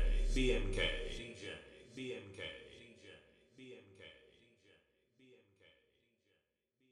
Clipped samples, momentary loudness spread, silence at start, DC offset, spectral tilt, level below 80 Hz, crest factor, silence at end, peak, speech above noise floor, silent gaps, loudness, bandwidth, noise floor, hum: under 0.1%; 23 LU; 0 s; under 0.1%; -4.5 dB/octave; -44 dBFS; 20 dB; 2.8 s; -22 dBFS; 46 dB; none; -41 LUFS; 11 kHz; -83 dBFS; none